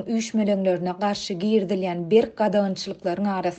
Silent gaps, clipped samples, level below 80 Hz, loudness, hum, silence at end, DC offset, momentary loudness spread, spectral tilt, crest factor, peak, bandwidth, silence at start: none; under 0.1%; -62 dBFS; -23 LUFS; none; 0 s; under 0.1%; 6 LU; -6 dB/octave; 16 dB; -6 dBFS; 8.6 kHz; 0 s